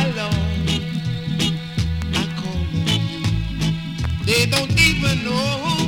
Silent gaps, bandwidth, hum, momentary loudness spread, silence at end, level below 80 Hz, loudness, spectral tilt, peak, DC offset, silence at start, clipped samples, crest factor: none; 18 kHz; none; 9 LU; 0 s; -32 dBFS; -20 LUFS; -4.5 dB/octave; -2 dBFS; under 0.1%; 0 s; under 0.1%; 18 dB